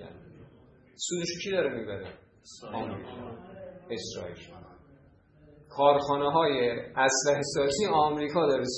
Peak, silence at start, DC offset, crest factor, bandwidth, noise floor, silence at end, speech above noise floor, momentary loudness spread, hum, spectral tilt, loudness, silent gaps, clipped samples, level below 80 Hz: -8 dBFS; 0 s; under 0.1%; 22 dB; 9.4 kHz; -59 dBFS; 0 s; 31 dB; 21 LU; none; -3.5 dB/octave; -28 LUFS; none; under 0.1%; -62 dBFS